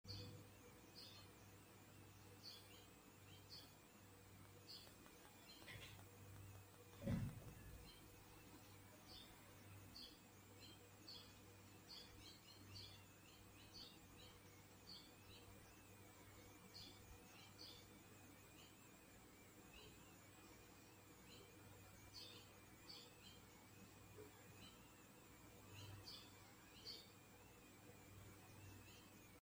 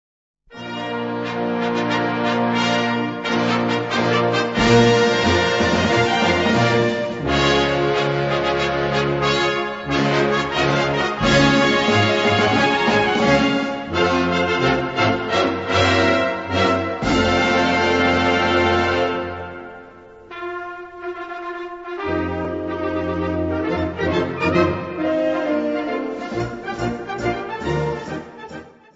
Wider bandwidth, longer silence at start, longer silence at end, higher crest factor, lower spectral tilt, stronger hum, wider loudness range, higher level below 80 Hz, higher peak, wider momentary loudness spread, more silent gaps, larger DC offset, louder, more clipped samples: first, 16.5 kHz vs 8 kHz; second, 0.05 s vs 0.5 s; second, 0 s vs 0.25 s; first, 28 dB vs 18 dB; about the same, -4 dB/octave vs -5 dB/octave; neither; about the same, 7 LU vs 8 LU; second, -74 dBFS vs -42 dBFS; second, -34 dBFS vs -2 dBFS; second, 7 LU vs 13 LU; neither; neither; second, -61 LUFS vs -19 LUFS; neither